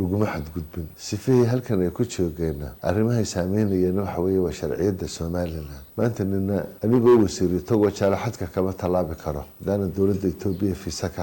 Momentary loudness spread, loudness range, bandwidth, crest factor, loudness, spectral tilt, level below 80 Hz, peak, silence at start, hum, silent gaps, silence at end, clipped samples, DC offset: 11 LU; 3 LU; 17.5 kHz; 14 dB; -24 LUFS; -7 dB/octave; -44 dBFS; -10 dBFS; 0 s; none; none; 0 s; under 0.1%; under 0.1%